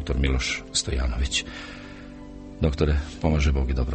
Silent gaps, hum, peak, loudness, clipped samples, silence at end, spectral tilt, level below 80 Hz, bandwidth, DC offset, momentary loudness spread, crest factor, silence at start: none; none; -8 dBFS; -25 LUFS; under 0.1%; 0 s; -4.5 dB/octave; -28 dBFS; 8.8 kHz; under 0.1%; 18 LU; 18 dB; 0 s